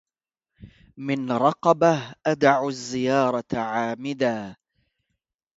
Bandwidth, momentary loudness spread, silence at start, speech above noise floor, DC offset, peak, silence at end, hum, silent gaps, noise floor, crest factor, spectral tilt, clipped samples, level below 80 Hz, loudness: 8 kHz; 9 LU; 0.6 s; 66 dB; under 0.1%; -4 dBFS; 1.05 s; none; none; -88 dBFS; 20 dB; -5.5 dB/octave; under 0.1%; -62 dBFS; -23 LUFS